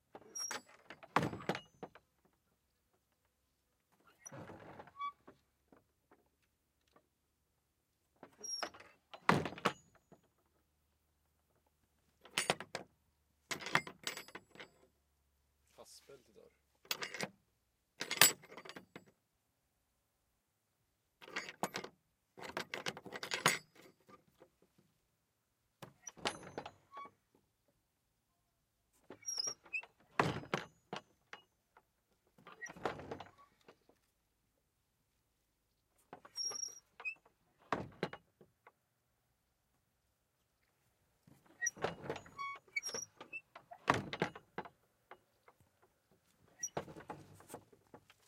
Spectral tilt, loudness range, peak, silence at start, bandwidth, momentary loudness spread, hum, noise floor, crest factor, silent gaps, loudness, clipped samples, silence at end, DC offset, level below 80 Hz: -2 dB/octave; 17 LU; -6 dBFS; 0.15 s; 16 kHz; 21 LU; none; -83 dBFS; 40 dB; none; -40 LUFS; under 0.1%; 0.3 s; under 0.1%; -78 dBFS